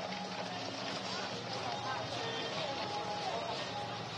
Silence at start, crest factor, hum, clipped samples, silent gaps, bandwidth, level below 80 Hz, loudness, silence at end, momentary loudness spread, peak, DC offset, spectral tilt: 0 s; 16 dB; none; under 0.1%; none; 12.5 kHz; -72 dBFS; -38 LUFS; 0 s; 3 LU; -24 dBFS; under 0.1%; -3.5 dB/octave